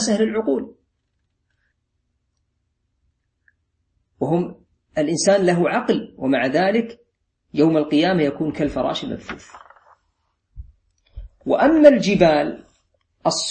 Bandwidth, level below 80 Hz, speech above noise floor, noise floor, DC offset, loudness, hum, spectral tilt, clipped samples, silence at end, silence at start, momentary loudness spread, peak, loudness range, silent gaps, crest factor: 8.8 kHz; -50 dBFS; 54 dB; -72 dBFS; under 0.1%; -19 LUFS; none; -5 dB/octave; under 0.1%; 0 s; 0 s; 15 LU; 0 dBFS; 11 LU; none; 20 dB